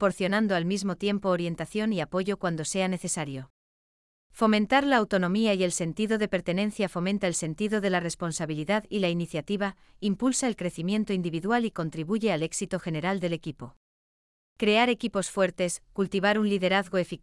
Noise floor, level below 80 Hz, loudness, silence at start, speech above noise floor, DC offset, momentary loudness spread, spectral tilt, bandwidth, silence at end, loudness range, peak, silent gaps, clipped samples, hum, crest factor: under -90 dBFS; -58 dBFS; -27 LUFS; 0 s; over 63 dB; under 0.1%; 7 LU; -4.5 dB/octave; 12 kHz; 0.05 s; 4 LU; -10 dBFS; 3.50-4.30 s, 13.77-14.56 s; under 0.1%; none; 18 dB